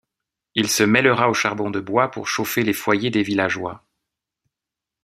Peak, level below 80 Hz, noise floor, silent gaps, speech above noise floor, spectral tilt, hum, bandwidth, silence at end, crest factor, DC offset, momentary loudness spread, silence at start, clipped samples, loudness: -2 dBFS; -62 dBFS; -86 dBFS; none; 67 dB; -4 dB/octave; none; 16 kHz; 1.25 s; 20 dB; under 0.1%; 9 LU; 0.55 s; under 0.1%; -20 LUFS